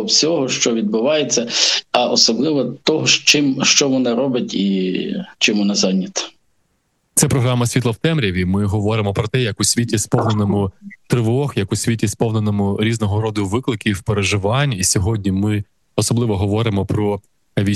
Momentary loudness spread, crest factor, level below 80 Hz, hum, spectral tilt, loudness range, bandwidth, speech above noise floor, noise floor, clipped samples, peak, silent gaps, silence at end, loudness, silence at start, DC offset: 8 LU; 18 dB; -46 dBFS; none; -4 dB/octave; 5 LU; 13 kHz; 49 dB; -66 dBFS; under 0.1%; 0 dBFS; none; 0 s; -17 LUFS; 0 s; under 0.1%